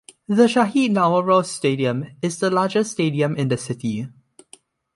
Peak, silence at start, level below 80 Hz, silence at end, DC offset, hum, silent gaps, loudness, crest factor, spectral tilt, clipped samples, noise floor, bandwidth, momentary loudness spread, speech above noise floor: -4 dBFS; 0.3 s; -64 dBFS; 0.85 s; under 0.1%; none; none; -20 LUFS; 16 dB; -5.5 dB/octave; under 0.1%; -52 dBFS; 11.5 kHz; 10 LU; 32 dB